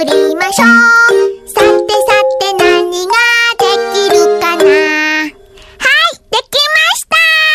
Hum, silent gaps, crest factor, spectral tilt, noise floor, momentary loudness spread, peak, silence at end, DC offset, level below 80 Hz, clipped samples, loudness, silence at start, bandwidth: none; none; 10 dB; -1.5 dB/octave; -37 dBFS; 7 LU; 0 dBFS; 0 s; under 0.1%; -46 dBFS; 0.2%; -9 LUFS; 0 s; 16.5 kHz